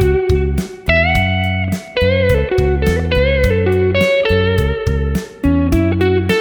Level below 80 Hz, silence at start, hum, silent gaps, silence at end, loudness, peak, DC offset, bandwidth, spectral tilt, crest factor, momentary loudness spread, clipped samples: -22 dBFS; 0 s; none; none; 0 s; -15 LUFS; 0 dBFS; under 0.1%; over 20 kHz; -6.5 dB/octave; 14 dB; 5 LU; under 0.1%